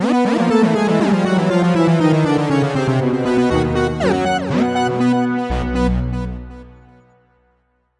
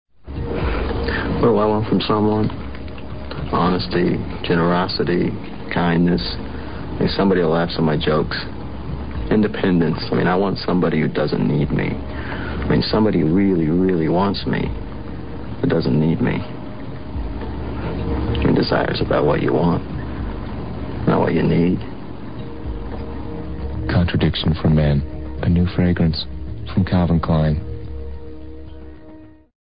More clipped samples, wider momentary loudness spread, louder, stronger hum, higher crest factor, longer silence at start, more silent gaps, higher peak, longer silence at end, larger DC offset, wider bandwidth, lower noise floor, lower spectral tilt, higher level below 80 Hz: neither; second, 6 LU vs 15 LU; first, -16 LUFS vs -20 LUFS; first, 60 Hz at -45 dBFS vs none; about the same, 14 dB vs 16 dB; about the same, 0 s vs 0.05 s; neither; about the same, -2 dBFS vs -4 dBFS; first, 1.3 s vs 0.1 s; second, under 0.1% vs 2%; first, 11 kHz vs 5.2 kHz; first, -62 dBFS vs -42 dBFS; second, -7 dB/octave vs -12 dB/octave; about the same, -32 dBFS vs -32 dBFS